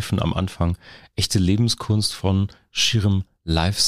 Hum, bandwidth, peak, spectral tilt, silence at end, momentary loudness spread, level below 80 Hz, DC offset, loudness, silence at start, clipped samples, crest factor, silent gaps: none; 15 kHz; -6 dBFS; -4.5 dB/octave; 0 s; 7 LU; -38 dBFS; under 0.1%; -21 LUFS; 0 s; under 0.1%; 16 dB; none